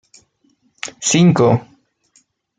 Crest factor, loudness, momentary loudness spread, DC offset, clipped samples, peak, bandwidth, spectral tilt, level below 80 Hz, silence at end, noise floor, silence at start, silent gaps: 16 dB; -14 LUFS; 19 LU; under 0.1%; under 0.1%; -2 dBFS; 9.4 kHz; -5 dB/octave; -56 dBFS; 0.95 s; -61 dBFS; 0.85 s; none